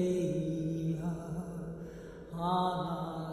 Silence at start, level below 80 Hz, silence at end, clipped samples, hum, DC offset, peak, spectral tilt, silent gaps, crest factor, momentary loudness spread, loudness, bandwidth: 0 s; -56 dBFS; 0 s; under 0.1%; none; under 0.1%; -20 dBFS; -7.5 dB/octave; none; 14 dB; 13 LU; -35 LUFS; 12.5 kHz